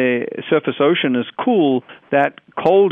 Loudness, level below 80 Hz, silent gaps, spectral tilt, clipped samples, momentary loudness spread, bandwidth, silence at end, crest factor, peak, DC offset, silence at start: -18 LUFS; -66 dBFS; none; -8.5 dB/octave; under 0.1%; 5 LU; 4.2 kHz; 0 s; 14 dB; -4 dBFS; under 0.1%; 0 s